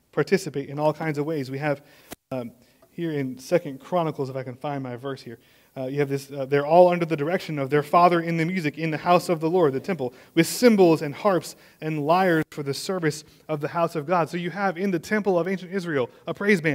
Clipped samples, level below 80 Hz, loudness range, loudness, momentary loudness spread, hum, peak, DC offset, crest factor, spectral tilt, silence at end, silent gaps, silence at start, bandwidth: under 0.1%; -68 dBFS; 8 LU; -24 LUFS; 14 LU; none; -4 dBFS; under 0.1%; 20 dB; -6 dB/octave; 0 s; none; 0.15 s; 16 kHz